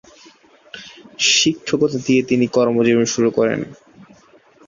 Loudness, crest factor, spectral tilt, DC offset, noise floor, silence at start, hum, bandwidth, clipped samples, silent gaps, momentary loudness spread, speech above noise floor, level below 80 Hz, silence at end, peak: -16 LUFS; 16 dB; -3.5 dB/octave; under 0.1%; -50 dBFS; 0.75 s; none; 7.6 kHz; under 0.1%; none; 22 LU; 33 dB; -58 dBFS; 0.95 s; -2 dBFS